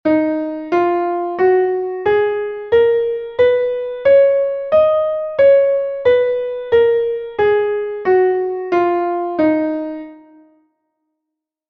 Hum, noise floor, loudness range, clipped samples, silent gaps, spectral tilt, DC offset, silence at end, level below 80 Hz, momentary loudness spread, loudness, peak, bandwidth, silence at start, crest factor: none; -80 dBFS; 4 LU; under 0.1%; none; -7.5 dB/octave; under 0.1%; 1.5 s; -54 dBFS; 8 LU; -16 LUFS; -4 dBFS; 5.6 kHz; 0.05 s; 12 dB